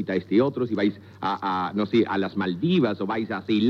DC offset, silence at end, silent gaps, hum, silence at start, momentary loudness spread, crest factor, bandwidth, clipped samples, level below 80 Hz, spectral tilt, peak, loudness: under 0.1%; 0 s; none; none; 0 s; 6 LU; 16 dB; 6.6 kHz; under 0.1%; -70 dBFS; -8 dB/octave; -8 dBFS; -25 LUFS